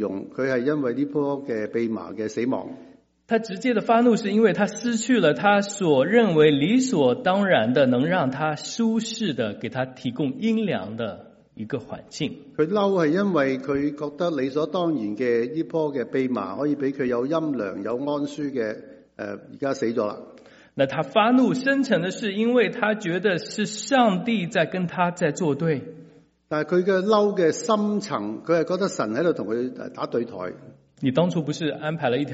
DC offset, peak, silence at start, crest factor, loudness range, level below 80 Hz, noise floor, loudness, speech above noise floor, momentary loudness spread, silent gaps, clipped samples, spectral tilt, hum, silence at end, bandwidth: under 0.1%; -4 dBFS; 0 s; 18 dB; 7 LU; -66 dBFS; -52 dBFS; -23 LUFS; 29 dB; 11 LU; none; under 0.1%; -5 dB/octave; none; 0 s; 8 kHz